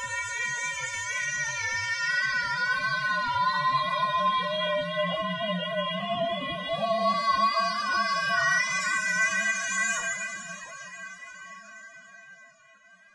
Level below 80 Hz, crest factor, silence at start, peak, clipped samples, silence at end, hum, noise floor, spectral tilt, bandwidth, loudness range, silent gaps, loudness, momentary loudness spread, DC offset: -68 dBFS; 14 dB; 0 s; -14 dBFS; under 0.1%; 0.65 s; none; -57 dBFS; -2 dB/octave; 11.5 kHz; 5 LU; none; -26 LUFS; 16 LU; under 0.1%